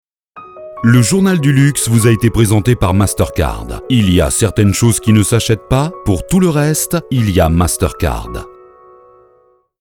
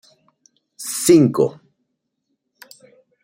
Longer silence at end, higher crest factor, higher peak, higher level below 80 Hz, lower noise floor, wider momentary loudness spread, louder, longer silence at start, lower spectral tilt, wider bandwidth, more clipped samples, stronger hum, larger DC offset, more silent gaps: second, 1.3 s vs 1.75 s; second, 12 dB vs 20 dB; about the same, 0 dBFS vs -2 dBFS; first, -28 dBFS vs -62 dBFS; second, -52 dBFS vs -74 dBFS; second, 8 LU vs 14 LU; first, -13 LUFS vs -16 LUFS; second, 0.35 s vs 0.8 s; about the same, -5.5 dB/octave vs -5.5 dB/octave; first, 18.5 kHz vs 16.5 kHz; neither; neither; neither; neither